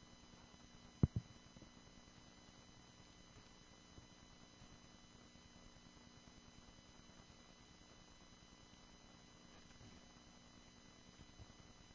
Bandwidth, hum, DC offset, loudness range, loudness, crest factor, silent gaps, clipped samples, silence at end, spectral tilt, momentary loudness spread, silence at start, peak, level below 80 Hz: 7.6 kHz; 60 Hz at -70 dBFS; under 0.1%; 13 LU; -55 LUFS; 34 dB; none; under 0.1%; 0 s; -6 dB/octave; 2 LU; 0 s; -20 dBFS; -64 dBFS